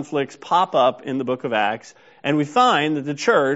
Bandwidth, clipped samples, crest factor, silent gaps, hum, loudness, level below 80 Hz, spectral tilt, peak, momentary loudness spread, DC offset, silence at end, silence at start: 8 kHz; under 0.1%; 16 dB; none; none; -20 LUFS; -68 dBFS; -3 dB/octave; -4 dBFS; 9 LU; under 0.1%; 0 s; 0 s